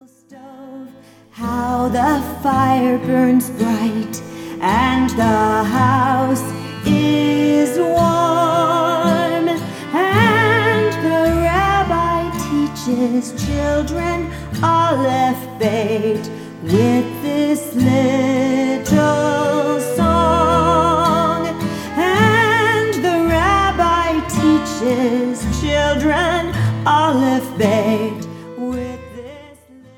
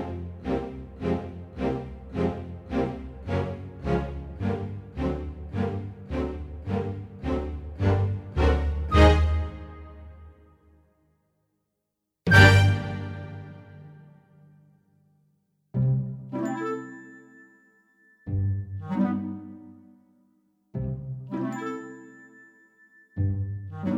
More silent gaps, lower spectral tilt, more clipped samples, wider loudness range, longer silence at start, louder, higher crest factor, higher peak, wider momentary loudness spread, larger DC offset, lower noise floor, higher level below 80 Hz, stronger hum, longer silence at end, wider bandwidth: neither; about the same, -5.5 dB/octave vs -6.5 dB/octave; neither; second, 3 LU vs 11 LU; first, 0.3 s vs 0 s; first, -16 LUFS vs -27 LUFS; second, 16 dB vs 24 dB; about the same, 0 dBFS vs -2 dBFS; second, 10 LU vs 22 LU; neither; second, -43 dBFS vs -82 dBFS; about the same, -34 dBFS vs -36 dBFS; neither; first, 0.5 s vs 0 s; first, 17.5 kHz vs 12.5 kHz